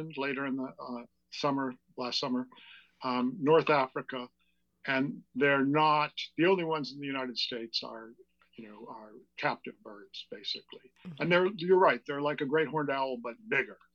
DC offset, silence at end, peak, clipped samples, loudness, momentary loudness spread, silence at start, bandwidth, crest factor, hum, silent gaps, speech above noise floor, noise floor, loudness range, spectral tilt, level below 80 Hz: under 0.1%; 0.2 s; -12 dBFS; under 0.1%; -31 LUFS; 20 LU; 0 s; 7.4 kHz; 20 dB; none; none; 26 dB; -58 dBFS; 9 LU; -5.5 dB/octave; -82 dBFS